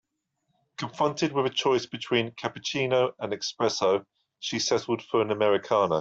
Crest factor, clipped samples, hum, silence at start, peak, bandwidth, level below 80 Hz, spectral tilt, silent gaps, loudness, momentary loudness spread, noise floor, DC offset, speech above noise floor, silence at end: 18 dB; under 0.1%; none; 0.8 s; -8 dBFS; 8 kHz; -70 dBFS; -4 dB/octave; none; -27 LUFS; 8 LU; -78 dBFS; under 0.1%; 51 dB; 0 s